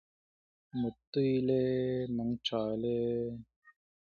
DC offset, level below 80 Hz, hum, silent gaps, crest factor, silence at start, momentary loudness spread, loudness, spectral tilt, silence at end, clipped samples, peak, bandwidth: under 0.1%; -64 dBFS; none; 1.07-1.13 s, 3.56-3.62 s; 14 dB; 0.75 s; 8 LU; -33 LUFS; -8 dB/octave; 0.35 s; under 0.1%; -20 dBFS; 6.8 kHz